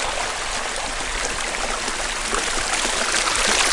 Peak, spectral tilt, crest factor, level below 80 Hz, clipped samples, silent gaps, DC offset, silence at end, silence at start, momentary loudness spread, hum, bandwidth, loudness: -2 dBFS; 0 dB/octave; 20 dB; -36 dBFS; under 0.1%; none; under 0.1%; 0 s; 0 s; 6 LU; none; 11.5 kHz; -21 LUFS